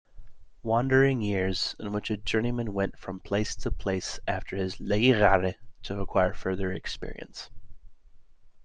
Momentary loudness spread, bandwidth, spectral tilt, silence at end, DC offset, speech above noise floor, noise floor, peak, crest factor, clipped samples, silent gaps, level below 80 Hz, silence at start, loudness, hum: 16 LU; 9.4 kHz; -5.5 dB/octave; 0.05 s; under 0.1%; 23 dB; -50 dBFS; -6 dBFS; 22 dB; under 0.1%; none; -40 dBFS; 0.15 s; -28 LUFS; none